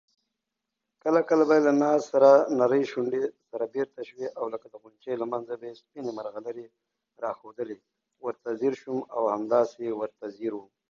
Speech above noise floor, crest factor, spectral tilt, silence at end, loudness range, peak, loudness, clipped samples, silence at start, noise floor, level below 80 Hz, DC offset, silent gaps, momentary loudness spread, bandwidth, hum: 59 dB; 22 dB; -6.5 dB/octave; 0.3 s; 13 LU; -6 dBFS; -26 LUFS; under 0.1%; 1.05 s; -85 dBFS; -78 dBFS; under 0.1%; none; 17 LU; 7.2 kHz; none